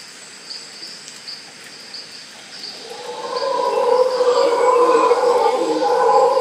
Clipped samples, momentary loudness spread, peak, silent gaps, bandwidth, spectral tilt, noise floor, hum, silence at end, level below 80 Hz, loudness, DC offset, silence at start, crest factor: under 0.1%; 20 LU; -2 dBFS; none; 14 kHz; -2.5 dB/octave; -38 dBFS; none; 0 s; -74 dBFS; -16 LUFS; under 0.1%; 0 s; 16 dB